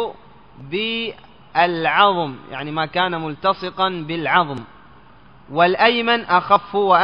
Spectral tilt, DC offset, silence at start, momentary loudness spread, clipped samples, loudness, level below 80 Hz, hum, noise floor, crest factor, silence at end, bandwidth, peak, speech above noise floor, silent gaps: -7 dB/octave; 0.3%; 0 s; 12 LU; under 0.1%; -19 LUFS; -56 dBFS; none; -48 dBFS; 20 dB; 0 s; 5.4 kHz; 0 dBFS; 29 dB; none